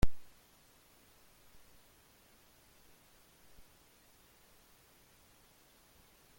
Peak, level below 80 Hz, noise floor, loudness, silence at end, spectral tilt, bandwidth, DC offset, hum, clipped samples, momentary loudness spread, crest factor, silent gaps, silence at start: -14 dBFS; -50 dBFS; -65 dBFS; -58 LUFS; 6.15 s; -5.5 dB/octave; 17 kHz; under 0.1%; none; under 0.1%; 0 LU; 26 dB; none; 0.05 s